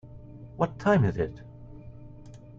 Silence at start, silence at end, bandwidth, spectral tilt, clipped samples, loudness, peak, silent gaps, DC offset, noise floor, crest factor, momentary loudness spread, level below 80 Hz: 0.05 s; 0.05 s; 7.8 kHz; -8.5 dB/octave; under 0.1%; -27 LUFS; -10 dBFS; none; under 0.1%; -47 dBFS; 20 dB; 24 LU; -50 dBFS